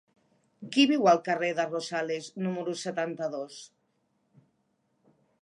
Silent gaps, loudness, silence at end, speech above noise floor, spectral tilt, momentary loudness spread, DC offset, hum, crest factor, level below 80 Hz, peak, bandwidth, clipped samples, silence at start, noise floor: none; -28 LUFS; 1.75 s; 46 dB; -4.5 dB/octave; 15 LU; under 0.1%; none; 20 dB; -84 dBFS; -10 dBFS; 11.5 kHz; under 0.1%; 0.6 s; -74 dBFS